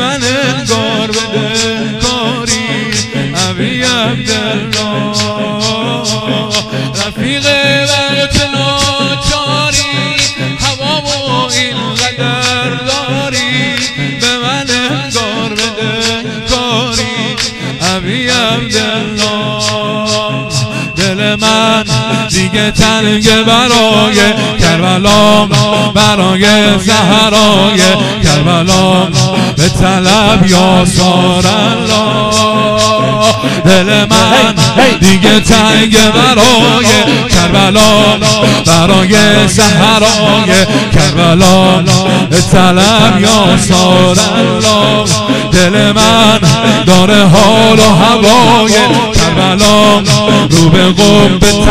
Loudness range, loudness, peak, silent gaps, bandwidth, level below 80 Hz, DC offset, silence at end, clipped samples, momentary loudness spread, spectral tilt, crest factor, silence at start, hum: 6 LU; -8 LUFS; 0 dBFS; none; 15.5 kHz; -28 dBFS; under 0.1%; 0 s; 2%; 8 LU; -4 dB/octave; 8 dB; 0 s; none